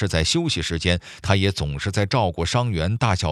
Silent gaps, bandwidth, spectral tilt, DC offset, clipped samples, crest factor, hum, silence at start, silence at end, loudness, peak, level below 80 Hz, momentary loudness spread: none; 12.5 kHz; -5 dB/octave; under 0.1%; under 0.1%; 22 dB; none; 0 s; 0 s; -22 LUFS; 0 dBFS; -40 dBFS; 4 LU